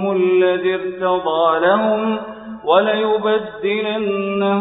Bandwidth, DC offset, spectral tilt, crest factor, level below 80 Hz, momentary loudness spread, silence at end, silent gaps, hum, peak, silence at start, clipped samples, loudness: 4 kHz; under 0.1%; -11 dB/octave; 16 dB; -58 dBFS; 6 LU; 0 s; none; none; 0 dBFS; 0 s; under 0.1%; -17 LUFS